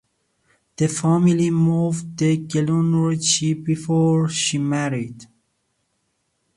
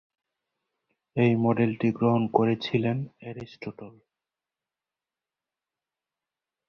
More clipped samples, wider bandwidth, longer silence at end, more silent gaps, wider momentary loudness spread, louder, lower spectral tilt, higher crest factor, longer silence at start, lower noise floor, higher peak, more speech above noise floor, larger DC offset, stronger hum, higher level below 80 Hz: neither; first, 11.5 kHz vs 6.2 kHz; second, 1.35 s vs 2.8 s; neither; second, 6 LU vs 17 LU; first, -20 LUFS vs -25 LUFS; second, -5 dB/octave vs -9 dB/octave; second, 16 dB vs 24 dB; second, 0.8 s vs 1.15 s; second, -71 dBFS vs under -90 dBFS; about the same, -6 dBFS vs -4 dBFS; second, 52 dB vs over 65 dB; neither; neither; first, -60 dBFS vs -66 dBFS